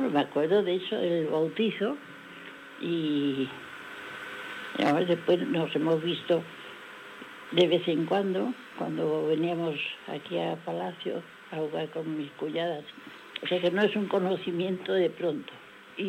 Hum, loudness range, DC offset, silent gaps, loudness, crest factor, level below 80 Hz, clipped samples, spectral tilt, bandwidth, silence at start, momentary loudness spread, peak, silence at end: none; 5 LU; under 0.1%; none; -29 LUFS; 20 dB; -80 dBFS; under 0.1%; -6.5 dB/octave; 16 kHz; 0 s; 17 LU; -10 dBFS; 0 s